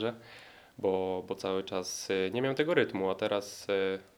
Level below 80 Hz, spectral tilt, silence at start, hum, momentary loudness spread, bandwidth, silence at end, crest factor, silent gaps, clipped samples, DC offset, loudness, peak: -74 dBFS; -4.5 dB/octave; 0 s; none; 12 LU; 17.5 kHz; 0.15 s; 22 dB; none; under 0.1%; under 0.1%; -32 LUFS; -10 dBFS